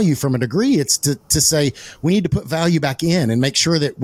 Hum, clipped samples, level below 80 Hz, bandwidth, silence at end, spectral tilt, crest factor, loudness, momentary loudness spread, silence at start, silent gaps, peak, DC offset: none; under 0.1%; -42 dBFS; 16.5 kHz; 0 s; -4 dB/octave; 16 dB; -17 LUFS; 4 LU; 0 s; none; -2 dBFS; under 0.1%